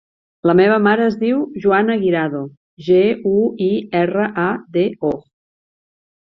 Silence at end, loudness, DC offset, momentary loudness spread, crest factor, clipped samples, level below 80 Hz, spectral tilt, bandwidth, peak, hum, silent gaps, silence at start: 1.2 s; -17 LUFS; under 0.1%; 9 LU; 16 dB; under 0.1%; -56 dBFS; -9 dB/octave; 6 kHz; -2 dBFS; none; 2.57-2.77 s; 0.45 s